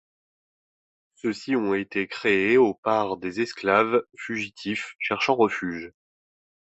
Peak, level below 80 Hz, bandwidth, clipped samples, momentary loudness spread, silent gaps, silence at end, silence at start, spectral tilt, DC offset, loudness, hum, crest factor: -4 dBFS; -64 dBFS; 8.2 kHz; under 0.1%; 11 LU; 2.78-2.83 s; 0.75 s; 1.25 s; -5.5 dB/octave; under 0.1%; -24 LUFS; none; 20 dB